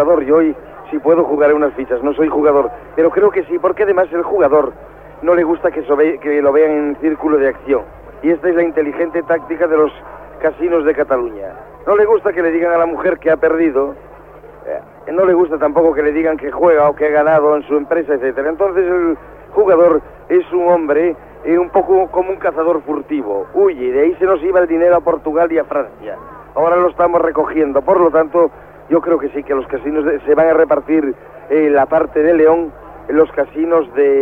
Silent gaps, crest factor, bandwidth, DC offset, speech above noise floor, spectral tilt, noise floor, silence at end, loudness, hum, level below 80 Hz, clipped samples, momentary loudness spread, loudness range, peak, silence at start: none; 14 dB; 3.7 kHz; under 0.1%; 24 dB; -9 dB/octave; -37 dBFS; 0 s; -14 LUFS; none; -44 dBFS; under 0.1%; 8 LU; 2 LU; 0 dBFS; 0 s